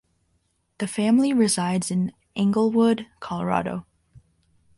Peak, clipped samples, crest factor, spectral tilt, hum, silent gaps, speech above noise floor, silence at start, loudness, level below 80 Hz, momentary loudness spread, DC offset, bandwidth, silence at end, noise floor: -8 dBFS; under 0.1%; 16 dB; -5.5 dB/octave; none; none; 48 dB; 0.8 s; -23 LUFS; -60 dBFS; 12 LU; under 0.1%; 11.5 kHz; 0.6 s; -70 dBFS